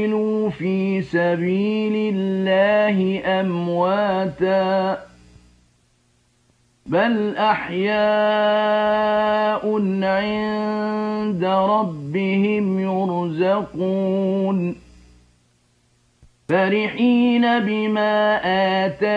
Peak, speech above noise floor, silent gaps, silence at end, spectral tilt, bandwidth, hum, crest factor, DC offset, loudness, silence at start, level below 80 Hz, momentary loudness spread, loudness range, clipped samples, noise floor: -6 dBFS; 42 dB; none; 0 s; -8 dB/octave; 7.6 kHz; none; 14 dB; under 0.1%; -20 LUFS; 0 s; -58 dBFS; 5 LU; 5 LU; under 0.1%; -61 dBFS